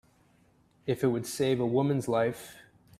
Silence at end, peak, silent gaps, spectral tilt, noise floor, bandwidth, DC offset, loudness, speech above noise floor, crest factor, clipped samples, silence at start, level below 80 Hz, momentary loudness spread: 0.4 s; -14 dBFS; none; -6 dB/octave; -65 dBFS; 15.5 kHz; under 0.1%; -29 LUFS; 36 dB; 16 dB; under 0.1%; 0.85 s; -66 dBFS; 14 LU